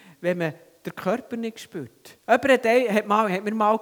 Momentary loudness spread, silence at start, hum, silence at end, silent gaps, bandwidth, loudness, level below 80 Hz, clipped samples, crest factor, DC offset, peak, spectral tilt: 19 LU; 0.2 s; none; 0 s; none; 20 kHz; -23 LUFS; -70 dBFS; under 0.1%; 20 dB; under 0.1%; -4 dBFS; -5.5 dB/octave